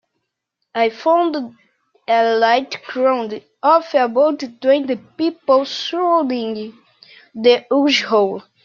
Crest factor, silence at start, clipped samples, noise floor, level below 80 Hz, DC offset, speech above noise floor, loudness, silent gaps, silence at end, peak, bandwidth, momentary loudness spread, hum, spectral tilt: 16 dB; 0.75 s; under 0.1%; -76 dBFS; -70 dBFS; under 0.1%; 59 dB; -17 LUFS; none; 0.25 s; -2 dBFS; 7.2 kHz; 12 LU; none; -4 dB/octave